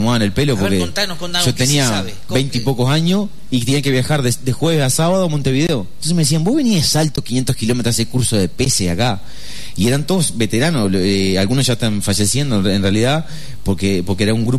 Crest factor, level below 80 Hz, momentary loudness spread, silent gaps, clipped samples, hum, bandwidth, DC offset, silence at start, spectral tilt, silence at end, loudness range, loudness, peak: 12 dB; -40 dBFS; 5 LU; none; under 0.1%; none; 13.5 kHz; 6%; 0 s; -4.5 dB/octave; 0 s; 1 LU; -16 LUFS; -4 dBFS